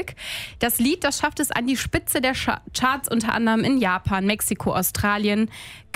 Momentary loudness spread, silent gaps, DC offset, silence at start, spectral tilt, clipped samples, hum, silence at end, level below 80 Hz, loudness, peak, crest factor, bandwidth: 5 LU; none; under 0.1%; 0 s; -3.5 dB/octave; under 0.1%; none; 0.15 s; -44 dBFS; -22 LUFS; -6 dBFS; 16 dB; 16 kHz